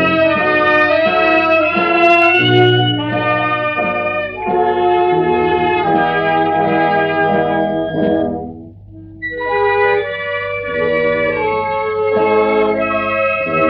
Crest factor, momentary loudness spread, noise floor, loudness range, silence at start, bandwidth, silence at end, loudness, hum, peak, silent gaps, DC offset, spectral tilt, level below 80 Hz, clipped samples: 14 dB; 8 LU; -35 dBFS; 6 LU; 0 s; 6.4 kHz; 0 s; -14 LUFS; none; -2 dBFS; none; under 0.1%; -7.5 dB/octave; -46 dBFS; under 0.1%